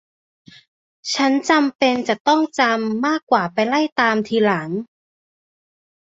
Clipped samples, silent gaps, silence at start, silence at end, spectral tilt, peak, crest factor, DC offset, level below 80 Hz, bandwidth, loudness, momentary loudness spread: under 0.1%; 1.75-1.79 s, 2.20-2.25 s, 3.23-3.27 s, 3.92-3.96 s; 1.05 s; 1.3 s; -4 dB/octave; -2 dBFS; 18 dB; under 0.1%; -64 dBFS; 8 kHz; -18 LUFS; 7 LU